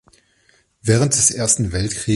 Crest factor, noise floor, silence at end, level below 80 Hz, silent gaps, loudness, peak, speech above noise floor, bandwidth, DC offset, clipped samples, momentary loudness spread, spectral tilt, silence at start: 18 dB; -58 dBFS; 0 s; -38 dBFS; none; -17 LUFS; -2 dBFS; 41 dB; 11.5 kHz; under 0.1%; under 0.1%; 8 LU; -4 dB/octave; 0.85 s